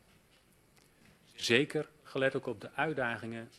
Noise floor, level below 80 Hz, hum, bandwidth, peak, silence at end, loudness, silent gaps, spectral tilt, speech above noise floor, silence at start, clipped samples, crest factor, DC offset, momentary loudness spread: -66 dBFS; -72 dBFS; none; 13.5 kHz; -12 dBFS; 0.1 s; -33 LUFS; none; -4.5 dB/octave; 33 dB; 1.35 s; under 0.1%; 24 dB; under 0.1%; 12 LU